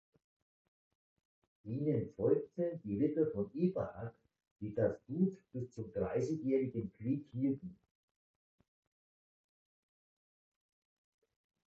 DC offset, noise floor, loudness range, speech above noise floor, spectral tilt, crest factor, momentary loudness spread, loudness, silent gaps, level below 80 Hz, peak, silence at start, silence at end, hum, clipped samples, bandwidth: under 0.1%; under -90 dBFS; 7 LU; over 53 dB; -10.5 dB/octave; 20 dB; 12 LU; -37 LUFS; 4.51-4.56 s; -68 dBFS; -18 dBFS; 1.65 s; 3.95 s; none; under 0.1%; 7.4 kHz